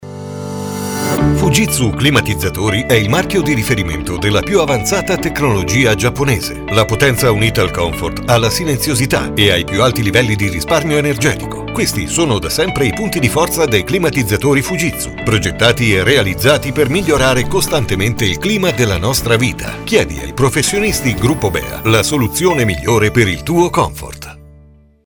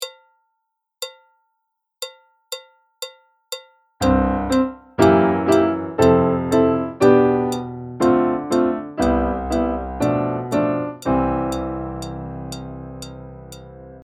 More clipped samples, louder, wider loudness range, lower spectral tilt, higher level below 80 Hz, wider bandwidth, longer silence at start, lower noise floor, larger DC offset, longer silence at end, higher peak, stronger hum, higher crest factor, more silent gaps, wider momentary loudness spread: neither; first, -14 LUFS vs -19 LUFS; second, 2 LU vs 13 LU; second, -4.5 dB/octave vs -6.5 dB/octave; first, -30 dBFS vs -38 dBFS; first, over 20 kHz vs 17 kHz; about the same, 0 s vs 0 s; second, -44 dBFS vs -76 dBFS; neither; first, 0.55 s vs 0.05 s; about the same, 0 dBFS vs 0 dBFS; neither; second, 14 dB vs 20 dB; neither; second, 6 LU vs 19 LU